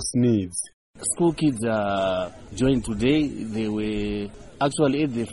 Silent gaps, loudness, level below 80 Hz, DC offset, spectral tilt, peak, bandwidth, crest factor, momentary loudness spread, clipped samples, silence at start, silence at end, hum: 0.73-0.94 s; -24 LUFS; -44 dBFS; 0.2%; -5.5 dB/octave; -8 dBFS; 11.5 kHz; 16 dB; 9 LU; under 0.1%; 0 s; 0 s; none